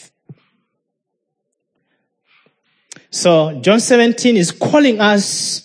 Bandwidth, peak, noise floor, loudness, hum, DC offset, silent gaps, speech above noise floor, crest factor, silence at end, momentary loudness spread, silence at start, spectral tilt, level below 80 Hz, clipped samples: 10.5 kHz; 0 dBFS; -75 dBFS; -13 LUFS; none; under 0.1%; none; 62 dB; 16 dB; 0.05 s; 5 LU; 0.3 s; -4 dB/octave; -68 dBFS; under 0.1%